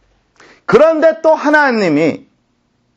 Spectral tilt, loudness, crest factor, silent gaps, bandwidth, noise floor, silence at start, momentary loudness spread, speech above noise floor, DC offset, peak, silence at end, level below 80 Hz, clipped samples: -6 dB/octave; -11 LUFS; 12 dB; none; 7.8 kHz; -61 dBFS; 0.7 s; 10 LU; 50 dB; under 0.1%; 0 dBFS; 0.8 s; -52 dBFS; under 0.1%